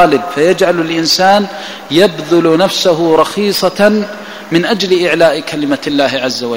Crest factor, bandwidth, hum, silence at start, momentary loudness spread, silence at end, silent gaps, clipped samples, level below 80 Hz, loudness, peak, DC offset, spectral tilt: 12 dB; 16.5 kHz; none; 0 s; 7 LU; 0 s; none; 0.2%; -50 dBFS; -11 LUFS; 0 dBFS; 0.6%; -4.5 dB/octave